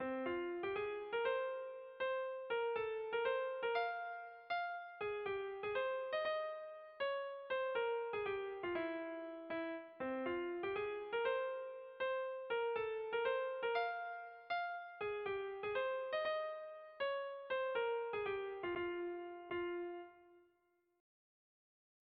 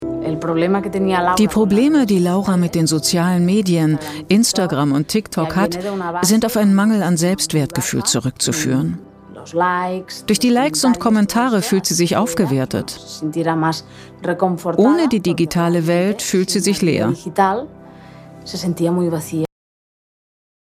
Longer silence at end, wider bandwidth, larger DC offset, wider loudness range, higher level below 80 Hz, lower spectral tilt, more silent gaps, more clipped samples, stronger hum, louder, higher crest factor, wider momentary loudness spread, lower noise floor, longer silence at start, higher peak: first, 1.6 s vs 1.35 s; second, 5.2 kHz vs 16 kHz; neither; about the same, 2 LU vs 3 LU; second, -78 dBFS vs -48 dBFS; second, -1.5 dB/octave vs -5 dB/octave; neither; neither; neither; second, -42 LUFS vs -17 LUFS; about the same, 16 dB vs 16 dB; about the same, 7 LU vs 9 LU; first, -80 dBFS vs -39 dBFS; about the same, 0 s vs 0 s; second, -26 dBFS vs 0 dBFS